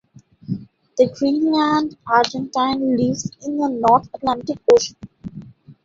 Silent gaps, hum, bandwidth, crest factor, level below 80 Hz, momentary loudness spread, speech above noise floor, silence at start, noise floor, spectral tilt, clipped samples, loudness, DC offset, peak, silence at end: none; none; 7.8 kHz; 20 dB; -54 dBFS; 15 LU; 21 dB; 0.5 s; -39 dBFS; -5 dB/octave; under 0.1%; -19 LUFS; under 0.1%; 0 dBFS; 0.1 s